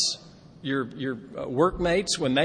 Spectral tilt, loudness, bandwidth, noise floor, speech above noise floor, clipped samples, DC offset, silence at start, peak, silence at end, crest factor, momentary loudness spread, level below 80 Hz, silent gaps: -3.5 dB/octave; -27 LUFS; 10 kHz; -48 dBFS; 22 dB; under 0.1%; under 0.1%; 0 s; -8 dBFS; 0 s; 20 dB; 11 LU; -48 dBFS; none